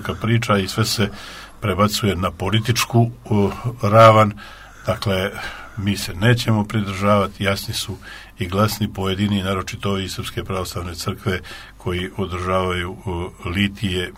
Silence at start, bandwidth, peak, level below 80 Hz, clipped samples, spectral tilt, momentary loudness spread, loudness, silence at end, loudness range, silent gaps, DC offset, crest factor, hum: 0 s; 16 kHz; 0 dBFS; -42 dBFS; under 0.1%; -5.5 dB/octave; 11 LU; -20 LUFS; 0 s; 8 LU; none; under 0.1%; 20 dB; none